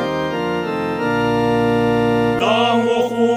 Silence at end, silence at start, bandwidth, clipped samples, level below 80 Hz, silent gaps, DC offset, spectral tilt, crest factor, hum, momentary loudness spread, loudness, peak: 0 s; 0 s; 16 kHz; under 0.1%; -46 dBFS; none; under 0.1%; -6 dB/octave; 14 dB; none; 6 LU; -17 LUFS; -4 dBFS